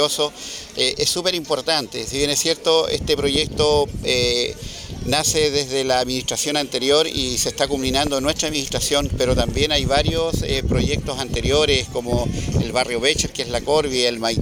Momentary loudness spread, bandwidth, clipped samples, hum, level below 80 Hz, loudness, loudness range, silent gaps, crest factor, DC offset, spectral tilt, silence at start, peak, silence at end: 5 LU; 19 kHz; under 0.1%; none; -34 dBFS; -19 LUFS; 1 LU; none; 18 dB; under 0.1%; -3.5 dB/octave; 0 s; -2 dBFS; 0 s